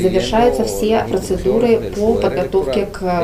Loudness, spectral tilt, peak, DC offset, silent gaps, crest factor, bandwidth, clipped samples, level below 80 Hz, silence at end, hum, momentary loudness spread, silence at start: -16 LUFS; -5.5 dB/octave; -2 dBFS; under 0.1%; none; 14 dB; 16 kHz; under 0.1%; -32 dBFS; 0 s; none; 5 LU; 0 s